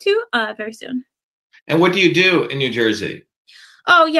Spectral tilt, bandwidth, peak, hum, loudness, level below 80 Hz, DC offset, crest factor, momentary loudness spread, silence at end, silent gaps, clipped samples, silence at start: -5 dB/octave; 12.5 kHz; 0 dBFS; none; -16 LUFS; -66 dBFS; under 0.1%; 18 dB; 16 LU; 0 s; 1.23-1.50 s, 1.62-1.66 s, 3.36-3.45 s; under 0.1%; 0.05 s